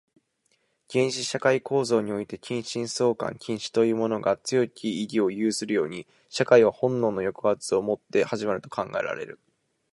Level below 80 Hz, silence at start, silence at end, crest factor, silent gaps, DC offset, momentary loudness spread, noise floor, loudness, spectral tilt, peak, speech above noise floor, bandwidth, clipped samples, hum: -66 dBFS; 0.9 s; 0.6 s; 22 dB; none; under 0.1%; 9 LU; -71 dBFS; -26 LUFS; -4.5 dB/octave; -4 dBFS; 46 dB; 11.5 kHz; under 0.1%; none